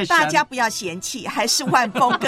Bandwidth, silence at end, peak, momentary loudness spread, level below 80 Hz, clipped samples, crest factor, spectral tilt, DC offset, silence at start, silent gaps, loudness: 16 kHz; 0 s; -4 dBFS; 10 LU; -60 dBFS; under 0.1%; 16 dB; -2.5 dB/octave; under 0.1%; 0 s; none; -19 LUFS